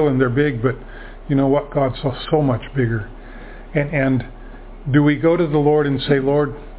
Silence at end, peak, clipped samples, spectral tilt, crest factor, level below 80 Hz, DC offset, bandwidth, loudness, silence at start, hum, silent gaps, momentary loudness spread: 0 s; 0 dBFS; under 0.1%; -11.5 dB/octave; 18 dB; -38 dBFS; under 0.1%; 4 kHz; -18 LUFS; 0 s; none; none; 19 LU